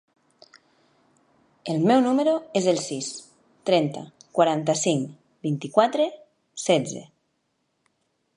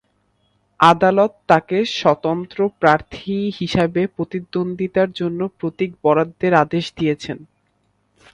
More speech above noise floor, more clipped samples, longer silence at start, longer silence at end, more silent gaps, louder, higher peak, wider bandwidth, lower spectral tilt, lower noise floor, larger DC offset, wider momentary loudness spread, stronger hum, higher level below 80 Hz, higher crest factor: first, 51 dB vs 47 dB; neither; first, 1.65 s vs 0.8 s; first, 1.3 s vs 0.9 s; neither; second, -24 LUFS vs -18 LUFS; second, -4 dBFS vs 0 dBFS; about the same, 11.5 kHz vs 11 kHz; second, -5 dB/octave vs -6.5 dB/octave; first, -73 dBFS vs -65 dBFS; neither; first, 15 LU vs 9 LU; neither; second, -74 dBFS vs -52 dBFS; about the same, 22 dB vs 18 dB